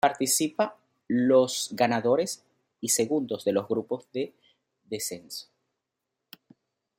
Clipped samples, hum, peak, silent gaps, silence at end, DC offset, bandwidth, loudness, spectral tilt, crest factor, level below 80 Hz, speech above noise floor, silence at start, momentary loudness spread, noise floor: under 0.1%; none; -8 dBFS; none; 1.55 s; under 0.1%; 16.5 kHz; -27 LUFS; -3.5 dB/octave; 20 dB; -74 dBFS; 58 dB; 0.05 s; 15 LU; -84 dBFS